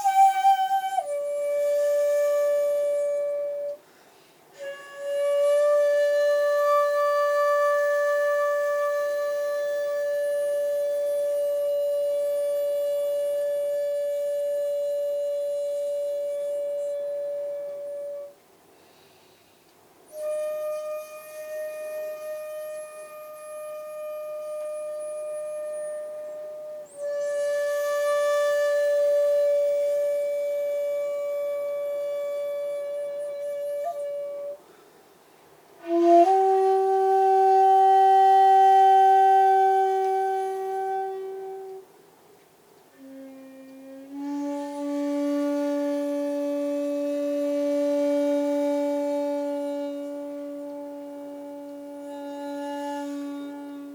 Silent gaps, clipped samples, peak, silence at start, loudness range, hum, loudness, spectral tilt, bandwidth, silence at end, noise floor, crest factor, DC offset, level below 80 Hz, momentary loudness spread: none; under 0.1%; -8 dBFS; 0 s; 16 LU; none; -24 LUFS; -3 dB/octave; 19.5 kHz; 0 s; -57 dBFS; 16 dB; under 0.1%; -84 dBFS; 18 LU